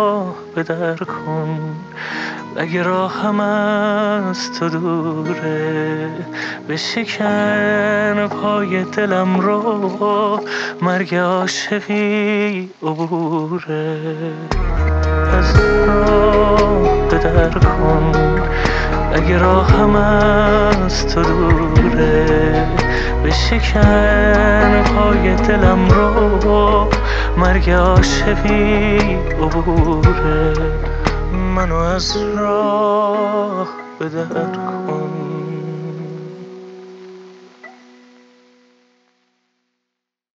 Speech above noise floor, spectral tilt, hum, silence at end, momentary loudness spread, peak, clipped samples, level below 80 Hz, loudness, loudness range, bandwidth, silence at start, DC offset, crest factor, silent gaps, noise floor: 66 dB; -6.5 dB/octave; none; 2.7 s; 12 LU; 0 dBFS; under 0.1%; -22 dBFS; -16 LUFS; 8 LU; 8 kHz; 0 s; under 0.1%; 16 dB; none; -80 dBFS